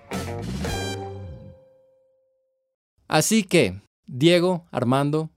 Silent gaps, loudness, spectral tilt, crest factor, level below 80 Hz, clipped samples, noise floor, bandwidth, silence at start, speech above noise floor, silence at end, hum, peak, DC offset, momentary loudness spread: 2.74-2.97 s, 3.87-4.03 s; -22 LUFS; -5 dB/octave; 22 dB; -48 dBFS; under 0.1%; -71 dBFS; 16 kHz; 0.1 s; 50 dB; 0.1 s; none; -4 dBFS; under 0.1%; 20 LU